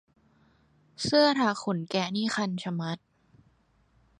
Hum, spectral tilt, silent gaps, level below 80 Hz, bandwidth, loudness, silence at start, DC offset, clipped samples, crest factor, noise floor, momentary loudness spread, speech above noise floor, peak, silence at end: none; -5 dB/octave; none; -68 dBFS; 11.5 kHz; -27 LUFS; 1 s; under 0.1%; under 0.1%; 20 dB; -66 dBFS; 12 LU; 39 dB; -10 dBFS; 1.2 s